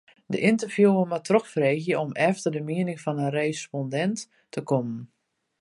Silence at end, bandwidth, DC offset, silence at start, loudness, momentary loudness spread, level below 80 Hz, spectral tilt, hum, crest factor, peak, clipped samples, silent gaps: 0.55 s; 11.5 kHz; under 0.1%; 0.3 s; -25 LUFS; 12 LU; -74 dBFS; -6 dB/octave; none; 20 dB; -6 dBFS; under 0.1%; none